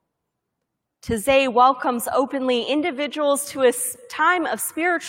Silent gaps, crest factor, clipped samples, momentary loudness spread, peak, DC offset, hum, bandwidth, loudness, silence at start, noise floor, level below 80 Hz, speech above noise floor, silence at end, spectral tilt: none; 18 dB; under 0.1%; 8 LU; -4 dBFS; under 0.1%; none; 17 kHz; -20 LUFS; 1.05 s; -79 dBFS; -54 dBFS; 59 dB; 0 s; -2.5 dB/octave